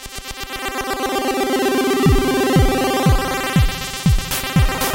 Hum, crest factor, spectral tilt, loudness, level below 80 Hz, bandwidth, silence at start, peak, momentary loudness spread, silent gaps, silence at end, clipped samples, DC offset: none; 14 dB; -5 dB/octave; -18 LUFS; -24 dBFS; 17 kHz; 0 s; -2 dBFS; 8 LU; none; 0 s; under 0.1%; under 0.1%